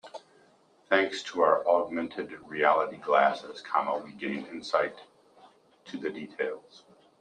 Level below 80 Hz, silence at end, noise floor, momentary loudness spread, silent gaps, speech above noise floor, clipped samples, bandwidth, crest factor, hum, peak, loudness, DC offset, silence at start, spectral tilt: -78 dBFS; 0.6 s; -62 dBFS; 14 LU; none; 34 dB; under 0.1%; 9.8 kHz; 22 dB; none; -8 dBFS; -29 LUFS; under 0.1%; 0.05 s; -4.5 dB/octave